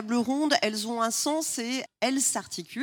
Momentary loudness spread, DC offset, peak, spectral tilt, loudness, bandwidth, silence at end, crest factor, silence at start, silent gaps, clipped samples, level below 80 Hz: 7 LU; under 0.1%; -8 dBFS; -2 dB/octave; -27 LUFS; 19 kHz; 0 s; 20 dB; 0 s; none; under 0.1%; -78 dBFS